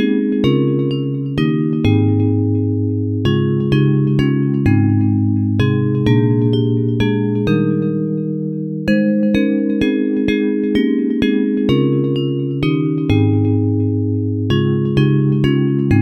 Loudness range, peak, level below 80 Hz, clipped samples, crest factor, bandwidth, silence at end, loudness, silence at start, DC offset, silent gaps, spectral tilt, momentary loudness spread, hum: 2 LU; -2 dBFS; -40 dBFS; under 0.1%; 14 dB; 6.4 kHz; 0 s; -16 LUFS; 0 s; under 0.1%; none; -9 dB/octave; 4 LU; none